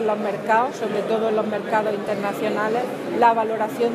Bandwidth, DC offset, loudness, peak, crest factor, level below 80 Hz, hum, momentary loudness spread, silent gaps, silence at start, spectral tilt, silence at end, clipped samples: 15.5 kHz; under 0.1%; -22 LUFS; -4 dBFS; 18 dB; -76 dBFS; none; 7 LU; none; 0 s; -5.5 dB/octave; 0 s; under 0.1%